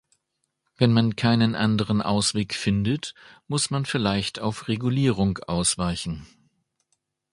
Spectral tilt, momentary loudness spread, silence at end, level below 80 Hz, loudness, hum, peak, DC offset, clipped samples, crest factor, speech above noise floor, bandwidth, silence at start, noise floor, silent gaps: -5 dB/octave; 9 LU; 1.05 s; -48 dBFS; -24 LUFS; none; -4 dBFS; under 0.1%; under 0.1%; 20 dB; 54 dB; 11.5 kHz; 0.8 s; -77 dBFS; none